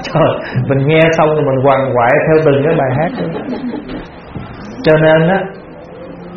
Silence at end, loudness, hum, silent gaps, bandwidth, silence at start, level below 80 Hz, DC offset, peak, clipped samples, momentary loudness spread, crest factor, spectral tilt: 0 s; -12 LUFS; none; none; 6.8 kHz; 0 s; -40 dBFS; under 0.1%; 0 dBFS; under 0.1%; 19 LU; 12 dB; -5.5 dB/octave